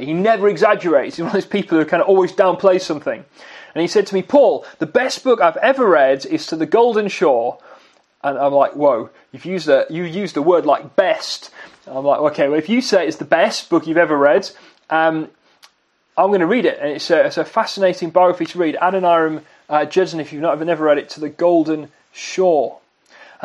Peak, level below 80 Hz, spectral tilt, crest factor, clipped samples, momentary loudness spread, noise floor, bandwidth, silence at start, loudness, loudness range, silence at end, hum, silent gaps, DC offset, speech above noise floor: 0 dBFS; -70 dBFS; -5 dB/octave; 16 dB; under 0.1%; 11 LU; -60 dBFS; 11.5 kHz; 0 s; -16 LUFS; 3 LU; 0.2 s; none; none; under 0.1%; 44 dB